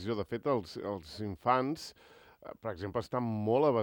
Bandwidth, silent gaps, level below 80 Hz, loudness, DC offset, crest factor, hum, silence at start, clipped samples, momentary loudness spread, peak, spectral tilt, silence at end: 18 kHz; none; -66 dBFS; -34 LUFS; under 0.1%; 20 dB; none; 0 s; under 0.1%; 13 LU; -14 dBFS; -7 dB/octave; 0 s